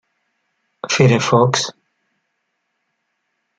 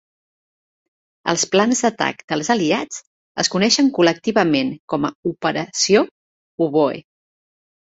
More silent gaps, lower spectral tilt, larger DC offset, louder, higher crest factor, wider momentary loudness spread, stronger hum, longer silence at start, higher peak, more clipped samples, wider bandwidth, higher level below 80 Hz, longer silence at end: second, none vs 2.24-2.28 s, 3.07-3.35 s, 4.79-4.88 s, 5.15-5.23 s, 6.11-6.58 s; first, -5 dB/octave vs -3.5 dB/octave; neither; first, -15 LUFS vs -18 LUFS; about the same, 18 dB vs 20 dB; first, 13 LU vs 9 LU; neither; second, 0.85 s vs 1.25 s; about the same, -2 dBFS vs 0 dBFS; neither; first, 9.2 kHz vs 8.2 kHz; about the same, -58 dBFS vs -60 dBFS; first, 1.9 s vs 0.95 s